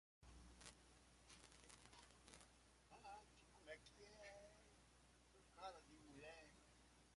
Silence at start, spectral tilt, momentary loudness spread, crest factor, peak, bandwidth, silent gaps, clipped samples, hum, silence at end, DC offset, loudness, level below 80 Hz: 0.2 s; -3 dB/octave; 8 LU; 28 dB; -38 dBFS; 11.5 kHz; none; under 0.1%; none; 0 s; under 0.1%; -64 LUFS; -76 dBFS